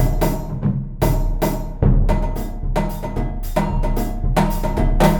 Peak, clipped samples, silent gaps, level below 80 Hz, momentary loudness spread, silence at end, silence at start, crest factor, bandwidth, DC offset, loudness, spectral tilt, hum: 0 dBFS; under 0.1%; none; -20 dBFS; 7 LU; 0 s; 0 s; 18 dB; 19 kHz; under 0.1%; -21 LUFS; -7 dB/octave; none